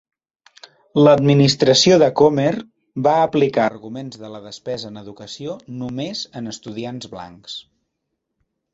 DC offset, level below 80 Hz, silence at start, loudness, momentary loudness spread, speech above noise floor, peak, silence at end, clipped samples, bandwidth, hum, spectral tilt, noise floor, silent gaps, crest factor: under 0.1%; -58 dBFS; 0.95 s; -16 LUFS; 21 LU; 59 dB; -2 dBFS; 1.15 s; under 0.1%; 8 kHz; none; -5 dB/octave; -77 dBFS; none; 18 dB